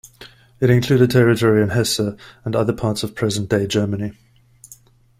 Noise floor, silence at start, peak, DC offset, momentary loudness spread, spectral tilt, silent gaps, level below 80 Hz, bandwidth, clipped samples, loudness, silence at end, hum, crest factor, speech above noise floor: -48 dBFS; 0.2 s; -2 dBFS; under 0.1%; 10 LU; -6 dB/octave; none; -48 dBFS; 16 kHz; under 0.1%; -18 LUFS; 0.45 s; none; 16 dB; 31 dB